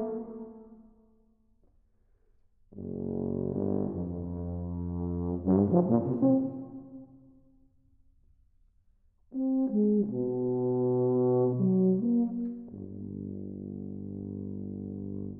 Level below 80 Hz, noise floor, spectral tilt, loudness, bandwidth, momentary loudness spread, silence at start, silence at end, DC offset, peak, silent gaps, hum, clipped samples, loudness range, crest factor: -56 dBFS; -66 dBFS; -15.5 dB/octave; -30 LUFS; 1.8 kHz; 16 LU; 0 s; 0 s; under 0.1%; -10 dBFS; none; none; under 0.1%; 10 LU; 20 dB